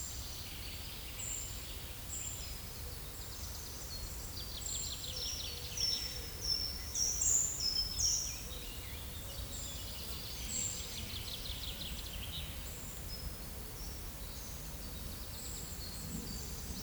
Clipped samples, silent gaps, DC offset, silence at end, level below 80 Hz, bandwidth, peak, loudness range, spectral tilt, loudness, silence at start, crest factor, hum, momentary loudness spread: under 0.1%; none; under 0.1%; 0 s; -48 dBFS; over 20 kHz; -20 dBFS; 10 LU; -1.5 dB/octave; -38 LUFS; 0 s; 22 dB; none; 12 LU